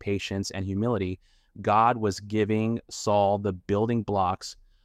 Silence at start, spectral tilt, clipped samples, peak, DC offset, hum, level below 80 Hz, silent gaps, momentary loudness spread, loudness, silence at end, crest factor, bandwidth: 0.05 s; -6 dB/octave; under 0.1%; -8 dBFS; under 0.1%; none; -56 dBFS; none; 10 LU; -27 LUFS; 0.3 s; 18 dB; 14 kHz